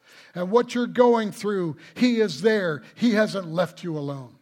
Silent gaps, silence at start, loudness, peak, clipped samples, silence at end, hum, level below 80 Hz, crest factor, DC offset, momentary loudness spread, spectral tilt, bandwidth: none; 0.35 s; -23 LUFS; -4 dBFS; under 0.1%; 0.15 s; none; -72 dBFS; 18 dB; under 0.1%; 12 LU; -6 dB/octave; 16 kHz